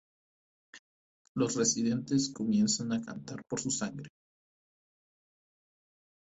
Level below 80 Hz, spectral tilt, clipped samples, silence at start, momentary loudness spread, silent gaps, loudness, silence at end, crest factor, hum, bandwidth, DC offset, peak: -70 dBFS; -4 dB/octave; under 0.1%; 0.75 s; 14 LU; 0.79-1.35 s; -31 LUFS; 2.25 s; 20 dB; none; 8.2 kHz; under 0.1%; -16 dBFS